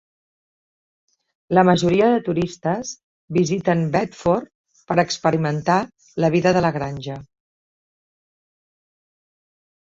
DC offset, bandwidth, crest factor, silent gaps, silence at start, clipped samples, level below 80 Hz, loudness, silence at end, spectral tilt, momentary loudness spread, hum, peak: under 0.1%; 7.8 kHz; 20 dB; 3.04-3.28 s, 4.55-4.64 s; 1.5 s; under 0.1%; -54 dBFS; -20 LUFS; 2.65 s; -6 dB/octave; 13 LU; none; -2 dBFS